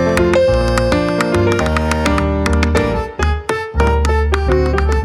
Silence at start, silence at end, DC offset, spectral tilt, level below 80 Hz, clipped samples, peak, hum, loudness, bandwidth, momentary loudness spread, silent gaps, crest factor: 0 s; 0 s; under 0.1%; -6 dB/octave; -20 dBFS; under 0.1%; 0 dBFS; none; -15 LUFS; 12.5 kHz; 5 LU; none; 14 dB